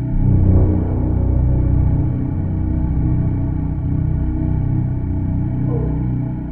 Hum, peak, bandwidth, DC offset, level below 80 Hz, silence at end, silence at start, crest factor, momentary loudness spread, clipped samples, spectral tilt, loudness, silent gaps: none; -4 dBFS; 2.5 kHz; under 0.1%; -22 dBFS; 0 s; 0 s; 14 dB; 5 LU; under 0.1%; -13.5 dB/octave; -19 LUFS; none